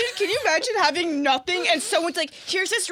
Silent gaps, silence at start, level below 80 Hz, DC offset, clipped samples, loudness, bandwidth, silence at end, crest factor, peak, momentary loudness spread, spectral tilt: none; 0 s; -68 dBFS; under 0.1%; under 0.1%; -22 LUFS; 18.5 kHz; 0 s; 18 dB; -4 dBFS; 4 LU; -1 dB/octave